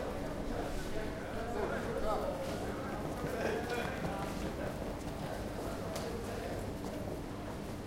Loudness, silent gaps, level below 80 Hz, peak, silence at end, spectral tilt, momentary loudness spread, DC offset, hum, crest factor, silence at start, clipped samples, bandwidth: -39 LUFS; none; -48 dBFS; -22 dBFS; 0 s; -5.5 dB/octave; 5 LU; under 0.1%; none; 16 dB; 0 s; under 0.1%; 16 kHz